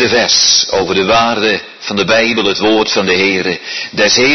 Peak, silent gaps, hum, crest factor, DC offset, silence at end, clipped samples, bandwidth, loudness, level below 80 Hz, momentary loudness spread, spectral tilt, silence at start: 0 dBFS; none; none; 12 dB; under 0.1%; 0 s; under 0.1%; 6.4 kHz; -11 LUFS; -46 dBFS; 9 LU; -2 dB/octave; 0 s